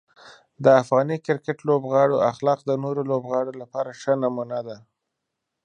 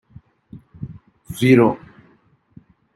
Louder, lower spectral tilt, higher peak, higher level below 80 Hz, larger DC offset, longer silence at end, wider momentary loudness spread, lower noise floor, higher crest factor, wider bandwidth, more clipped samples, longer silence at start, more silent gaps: second, -23 LUFS vs -16 LUFS; about the same, -7 dB/octave vs -7 dB/octave; about the same, -2 dBFS vs -2 dBFS; second, -72 dBFS vs -54 dBFS; neither; second, 0.85 s vs 1.2 s; second, 13 LU vs 23 LU; first, -81 dBFS vs -57 dBFS; about the same, 20 dB vs 20 dB; second, 9.4 kHz vs 13 kHz; neither; second, 0.25 s vs 0.55 s; neither